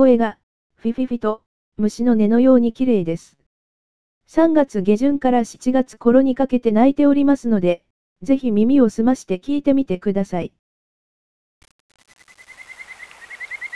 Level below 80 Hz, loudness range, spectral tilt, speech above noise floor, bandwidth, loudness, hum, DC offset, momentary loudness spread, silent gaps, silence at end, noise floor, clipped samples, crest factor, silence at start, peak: -48 dBFS; 8 LU; -7.5 dB/octave; 24 dB; 11 kHz; -18 LUFS; none; 2%; 18 LU; 0.43-0.70 s, 1.46-1.72 s, 3.46-4.21 s, 7.90-8.16 s, 10.59-11.61 s, 11.71-11.89 s; 0 s; -40 dBFS; under 0.1%; 16 dB; 0 s; -2 dBFS